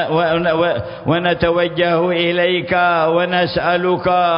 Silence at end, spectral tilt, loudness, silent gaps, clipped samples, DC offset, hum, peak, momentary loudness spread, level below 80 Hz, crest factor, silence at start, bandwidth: 0 s; -11 dB/octave; -16 LUFS; none; under 0.1%; under 0.1%; none; -2 dBFS; 2 LU; -44 dBFS; 14 dB; 0 s; 5.4 kHz